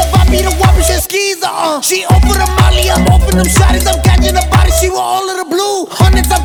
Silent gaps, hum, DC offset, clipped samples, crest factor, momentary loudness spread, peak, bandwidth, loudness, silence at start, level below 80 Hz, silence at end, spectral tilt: none; none; under 0.1%; 0.4%; 10 dB; 5 LU; 0 dBFS; 19.5 kHz; -10 LUFS; 0 s; -12 dBFS; 0 s; -4.5 dB/octave